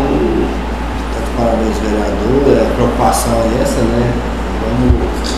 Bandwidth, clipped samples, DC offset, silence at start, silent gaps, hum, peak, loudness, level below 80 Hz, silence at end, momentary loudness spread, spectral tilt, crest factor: 14.5 kHz; under 0.1%; 2%; 0 s; none; none; 0 dBFS; -14 LUFS; -20 dBFS; 0 s; 8 LU; -6 dB/octave; 14 dB